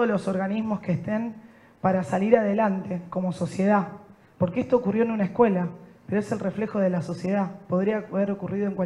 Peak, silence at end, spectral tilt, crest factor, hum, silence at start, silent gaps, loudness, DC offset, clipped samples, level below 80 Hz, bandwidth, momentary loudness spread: -4 dBFS; 0 s; -8.5 dB/octave; 22 dB; none; 0 s; none; -25 LUFS; under 0.1%; under 0.1%; -62 dBFS; 10.5 kHz; 8 LU